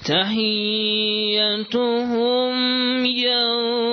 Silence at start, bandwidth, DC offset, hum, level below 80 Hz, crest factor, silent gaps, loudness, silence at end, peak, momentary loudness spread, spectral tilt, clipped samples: 0 s; 6.6 kHz; under 0.1%; none; -64 dBFS; 14 dB; none; -19 LUFS; 0 s; -6 dBFS; 3 LU; -5 dB/octave; under 0.1%